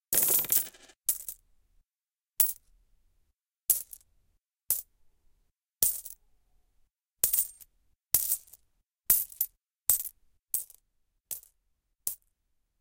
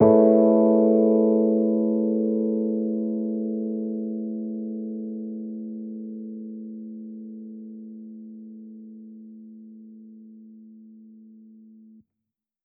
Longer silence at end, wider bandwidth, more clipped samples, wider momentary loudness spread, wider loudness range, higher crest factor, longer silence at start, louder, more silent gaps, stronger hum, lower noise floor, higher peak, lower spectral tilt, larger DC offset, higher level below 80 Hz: second, 0.65 s vs 1.65 s; first, 17 kHz vs 2.3 kHz; neither; second, 17 LU vs 25 LU; second, 5 LU vs 24 LU; first, 30 dB vs 20 dB; about the same, 0.1 s vs 0 s; second, -28 LUFS vs -23 LUFS; neither; neither; first, under -90 dBFS vs -85 dBFS; about the same, -4 dBFS vs -4 dBFS; second, 0.5 dB/octave vs -13.5 dB/octave; neither; first, -64 dBFS vs -72 dBFS